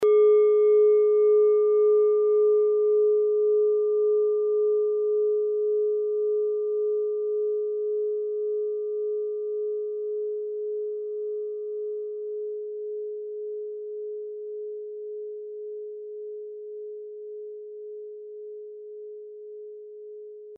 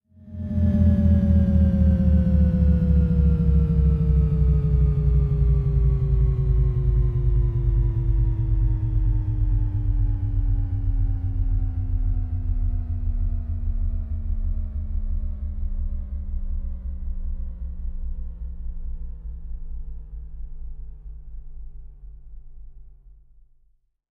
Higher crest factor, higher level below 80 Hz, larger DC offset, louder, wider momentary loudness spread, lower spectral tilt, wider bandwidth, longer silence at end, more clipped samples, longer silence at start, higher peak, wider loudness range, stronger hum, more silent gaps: about the same, 12 dB vs 14 dB; second, under -90 dBFS vs -24 dBFS; neither; about the same, -25 LUFS vs -23 LUFS; about the same, 20 LU vs 19 LU; second, -0.5 dB/octave vs -12 dB/octave; second, 2.3 kHz vs 3 kHz; second, 0 s vs 1.05 s; neither; second, 0 s vs 0.2 s; second, -14 dBFS vs -8 dBFS; about the same, 18 LU vs 19 LU; neither; neither